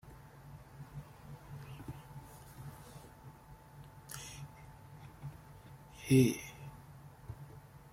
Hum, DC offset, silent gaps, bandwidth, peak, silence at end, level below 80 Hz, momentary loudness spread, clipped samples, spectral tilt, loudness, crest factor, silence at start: none; under 0.1%; none; 16.5 kHz; -16 dBFS; 0 s; -62 dBFS; 23 LU; under 0.1%; -6 dB/octave; -37 LUFS; 26 dB; 0.05 s